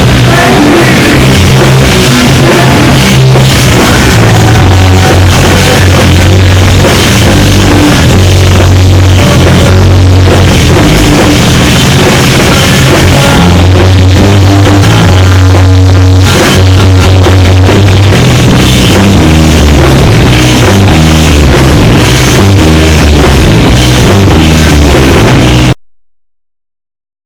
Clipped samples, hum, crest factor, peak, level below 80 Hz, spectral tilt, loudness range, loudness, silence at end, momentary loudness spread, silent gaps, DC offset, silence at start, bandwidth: 20%; none; 2 dB; 0 dBFS; -14 dBFS; -5 dB/octave; 0 LU; -3 LUFS; 1.5 s; 1 LU; none; under 0.1%; 0 s; over 20 kHz